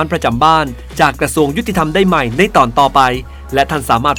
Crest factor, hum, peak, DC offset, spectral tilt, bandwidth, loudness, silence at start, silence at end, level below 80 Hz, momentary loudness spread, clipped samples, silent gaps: 12 dB; none; 0 dBFS; under 0.1%; -5 dB/octave; over 20 kHz; -13 LUFS; 0 s; 0 s; -30 dBFS; 5 LU; 0.3%; none